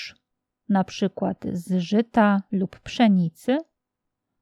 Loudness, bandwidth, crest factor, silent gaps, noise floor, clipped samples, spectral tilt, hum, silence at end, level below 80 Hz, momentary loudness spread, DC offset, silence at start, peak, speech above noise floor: -23 LUFS; 12 kHz; 18 dB; none; -82 dBFS; under 0.1%; -7 dB/octave; none; 0.8 s; -60 dBFS; 9 LU; under 0.1%; 0 s; -6 dBFS; 60 dB